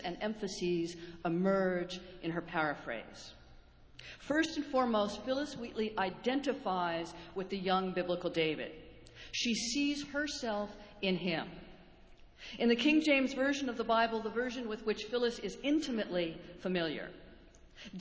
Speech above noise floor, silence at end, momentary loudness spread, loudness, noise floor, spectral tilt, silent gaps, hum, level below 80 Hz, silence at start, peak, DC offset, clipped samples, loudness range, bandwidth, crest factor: 23 dB; 0 s; 14 LU; -35 LUFS; -58 dBFS; -4.5 dB/octave; none; none; -62 dBFS; 0 s; -16 dBFS; under 0.1%; under 0.1%; 4 LU; 8 kHz; 20 dB